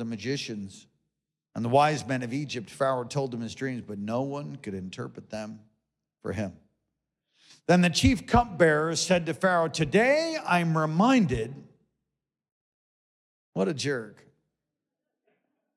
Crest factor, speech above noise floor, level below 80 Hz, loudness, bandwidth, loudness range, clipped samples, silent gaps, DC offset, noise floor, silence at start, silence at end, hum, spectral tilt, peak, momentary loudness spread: 18 dB; 60 dB; -50 dBFS; -26 LUFS; 13 kHz; 12 LU; under 0.1%; 12.52-13.53 s; under 0.1%; -86 dBFS; 0 s; 1.65 s; none; -5.5 dB/octave; -10 dBFS; 16 LU